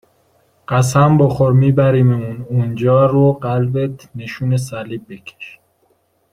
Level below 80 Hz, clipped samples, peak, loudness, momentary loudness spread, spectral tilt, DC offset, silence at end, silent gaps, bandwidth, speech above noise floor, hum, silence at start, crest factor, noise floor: -48 dBFS; under 0.1%; -2 dBFS; -15 LUFS; 18 LU; -7.5 dB/octave; under 0.1%; 0.85 s; none; 12.5 kHz; 46 dB; none; 0.7 s; 14 dB; -60 dBFS